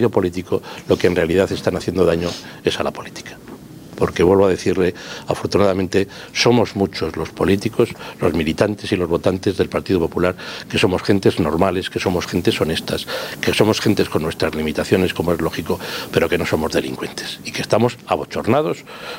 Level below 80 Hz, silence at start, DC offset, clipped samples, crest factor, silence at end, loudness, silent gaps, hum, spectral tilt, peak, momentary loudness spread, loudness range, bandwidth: -46 dBFS; 0 s; under 0.1%; under 0.1%; 18 dB; 0 s; -19 LUFS; none; none; -5.5 dB/octave; 0 dBFS; 9 LU; 2 LU; 16 kHz